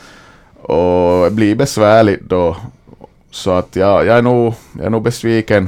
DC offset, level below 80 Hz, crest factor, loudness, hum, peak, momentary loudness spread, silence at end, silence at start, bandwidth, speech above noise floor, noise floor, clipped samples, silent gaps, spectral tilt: under 0.1%; -40 dBFS; 14 dB; -13 LUFS; none; 0 dBFS; 11 LU; 0 s; 0.7 s; 16.5 kHz; 30 dB; -42 dBFS; under 0.1%; none; -6.5 dB/octave